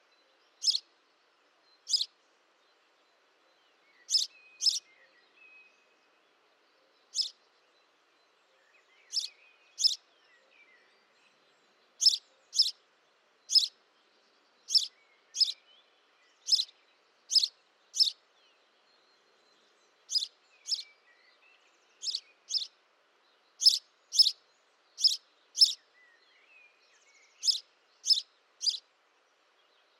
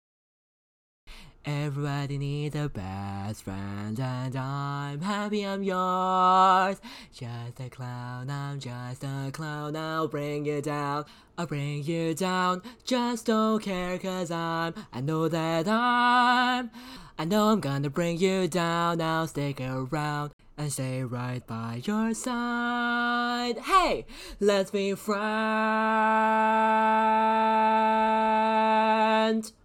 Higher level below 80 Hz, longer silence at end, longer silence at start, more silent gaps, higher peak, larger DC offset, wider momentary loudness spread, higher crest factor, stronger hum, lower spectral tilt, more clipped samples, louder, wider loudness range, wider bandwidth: second, under -90 dBFS vs -56 dBFS; first, 1.2 s vs 0.15 s; second, 0.6 s vs 1.05 s; second, none vs 20.33-20.39 s; about the same, -10 dBFS vs -10 dBFS; neither; first, 16 LU vs 13 LU; first, 24 dB vs 18 dB; neither; second, 6.5 dB/octave vs -5.5 dB/octave; neither; about the same, -28 LUFS vs -27 LUFS; about the same, 10 LU vs 9 LU; about the same, 16 kHz vs 17 kHz